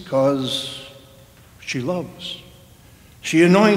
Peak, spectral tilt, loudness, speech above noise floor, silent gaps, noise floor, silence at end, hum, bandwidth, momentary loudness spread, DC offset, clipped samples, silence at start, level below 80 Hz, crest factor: 0 dBFS; -5.5 dB/octave; -21 LUFS; 30 dB; none; -47 dBFS; 0 s; none; 16 kHz; 21 LU; under 0.1%; under 0.1%; 0 s; -56 dBFS; 20 dB